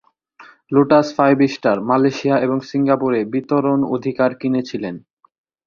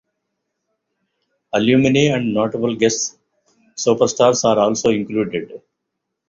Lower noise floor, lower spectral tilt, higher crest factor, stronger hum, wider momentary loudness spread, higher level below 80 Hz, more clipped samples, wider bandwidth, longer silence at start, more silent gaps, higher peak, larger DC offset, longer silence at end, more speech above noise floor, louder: second, -46 dBFS vs -78 dBFS; first, -7 dB/octave vs -4.5 dB/octave; about the same, 16 dB vs 18 dB; neither; about the same, 8 LU vs 10 LU; about the same, -60 dBFS vs -56 dBFS; neither; second, 7 kHz vs 7.8 kHz; second, 0.4 s vs 1.55 s; neither; about the same, -2 dBFS vs -2 dBFS; neither; about the same, 0.7 s vs 0.7 s; second, 30 dB vs 61 dB; about the same, -17 LUFS vs -17 LUFS